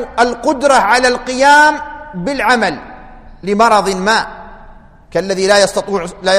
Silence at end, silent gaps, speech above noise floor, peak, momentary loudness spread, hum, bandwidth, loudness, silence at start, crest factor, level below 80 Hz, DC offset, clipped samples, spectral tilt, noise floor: 0 s; none; 26 dB; 0 dBFS; 14 LU; none; 15 kHz; -12 LUFS; 0 s; 14 dB; -40 dBFS; under 0.1%; under 0.1%; -3 dB/octave; -38 dBFS